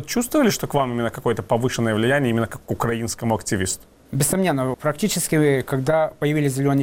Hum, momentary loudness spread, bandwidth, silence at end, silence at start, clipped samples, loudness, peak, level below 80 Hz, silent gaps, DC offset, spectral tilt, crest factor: none; 6 LU; 17 kHz; 0 s; 0 s; under 0.1%; -21 LUFS; -8 dBFS; -48 dBFS; none; under 0.1%; -5 dB/octave; 14 dB